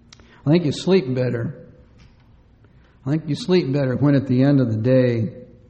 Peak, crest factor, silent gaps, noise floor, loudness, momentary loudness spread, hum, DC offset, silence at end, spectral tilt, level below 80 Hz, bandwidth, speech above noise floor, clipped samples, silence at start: -6 dBFS; 16 dB; none; -51 dBFS; -20 LUFS; 10 LU; none; under 0.1%; 0.25 s; -8 dB/octave; -54 dBFS; 9 kHz; 33 dB; under 0.1%; 0.45 s